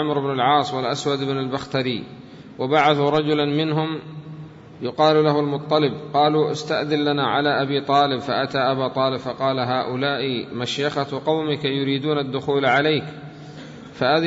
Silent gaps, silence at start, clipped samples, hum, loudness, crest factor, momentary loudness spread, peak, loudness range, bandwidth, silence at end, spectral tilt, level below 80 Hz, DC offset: none; 0 s; under 0.1%; none; -21 LUFS; 18 dB; 18 LU; -4 dBFS; 3 LU; 8 kHz; 0 s; -6 dB/octave; -60 dBFS; under 0.1%